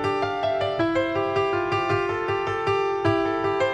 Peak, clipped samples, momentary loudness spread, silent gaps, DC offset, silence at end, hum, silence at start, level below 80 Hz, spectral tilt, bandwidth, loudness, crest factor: -10 dBFS; under 0.1%; 2 LU; none; under 0.1%; 0 s; none; 0 s; -52 dBFS; -6.5 dB/octave; 9.6 kHz; -24 LUFS; 14 dB